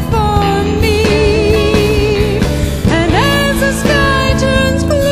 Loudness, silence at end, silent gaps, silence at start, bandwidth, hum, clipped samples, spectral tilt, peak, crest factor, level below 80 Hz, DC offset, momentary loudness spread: -12 LUFS; 0 s; none; 0 s; 16 kHz; none; under 0.1%; -5.5 dB/octave; 0 dBFS; 12 dB; -20 dBFS; under 0.1%; 3 LU